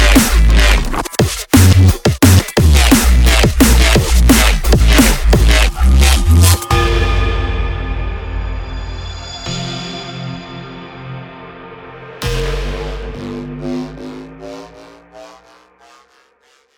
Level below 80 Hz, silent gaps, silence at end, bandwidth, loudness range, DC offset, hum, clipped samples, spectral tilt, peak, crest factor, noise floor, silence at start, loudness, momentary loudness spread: -16 dBFS; none; 1.5 s; 19 kHz; 16 LU; under 0.1%; none; under 0.1%; -4.5 dB/octave; 0 dBFS; 12 dB; -54 dBFS; 0 s; -12 LUFS; 21 LU